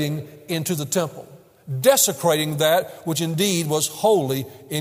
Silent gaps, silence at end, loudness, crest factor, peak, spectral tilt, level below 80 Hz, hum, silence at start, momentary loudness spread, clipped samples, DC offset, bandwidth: none; 0 s; -21 LUFS; 20 dB; -2 dBFS; -4 dB/octave; -66 dBFS; none; 0 s; 11 LU; under 0.1%; under 0.1%; 16 kHz